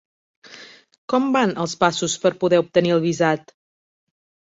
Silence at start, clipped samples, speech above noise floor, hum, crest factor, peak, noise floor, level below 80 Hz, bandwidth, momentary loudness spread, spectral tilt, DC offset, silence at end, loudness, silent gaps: 0.5 s; under 0.1%; 25 dB; none; 18 dB; -2 dBFS; -44 dBFS; -62 dBFS; 8 kHz; 7 LU; -5 dB/octave; under 0.1%; 1.1 s; -20 LUFS; 0.98-1.08 s